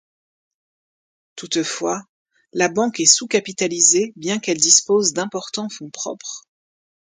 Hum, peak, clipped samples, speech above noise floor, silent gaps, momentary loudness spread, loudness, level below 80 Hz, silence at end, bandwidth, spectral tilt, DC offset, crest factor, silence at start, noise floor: none; 0 dBFS; under 0.1%; over 70 dB; 2.09-2.25 s; 17 LU; -17 LUFS; -70 dBFS; 0.8 s; 16 kHz; -1.5 dB/octave; under 0.1%; 22 dB; 1.35 s; under -90 dBFS